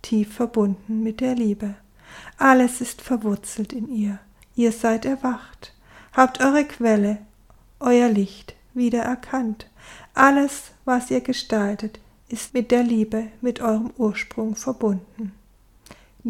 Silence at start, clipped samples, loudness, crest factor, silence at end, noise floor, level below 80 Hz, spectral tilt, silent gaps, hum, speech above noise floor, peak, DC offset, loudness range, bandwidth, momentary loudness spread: 0.05 s; under 0.1%; -22 LUFS; 22 dB; 0 s; -53 dBFS; -52 dBFS; -5 dB/octave; none; none; 32 dB; 0 dBFS; under 0.1%; 3 LU; 15.5 kHz; 16 LU